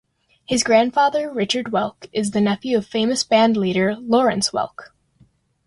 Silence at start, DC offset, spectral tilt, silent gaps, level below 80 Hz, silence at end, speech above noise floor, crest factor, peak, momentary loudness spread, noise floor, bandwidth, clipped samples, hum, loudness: 0.5 s; under 0.1%; -4 dB/octave; none; -58 dBFS; 0.85 s; 38 dB; 16 dB; -4 dBFS; 8 LU; -57 dBFS; 11.5 kHz; under 0.1%; none; -19 LUFS